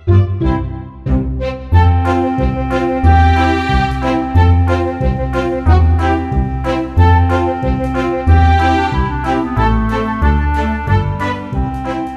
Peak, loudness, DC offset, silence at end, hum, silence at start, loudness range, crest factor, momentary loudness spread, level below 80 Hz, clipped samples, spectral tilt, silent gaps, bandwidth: 0 dBFS; -14 LUFS; under 0.1%; 0 s; none; 0.05 s; 2 LU; 12 dB; 8 LU; -18 dBFS; under 0.1%; -8 dB/octave; none; 7 kHz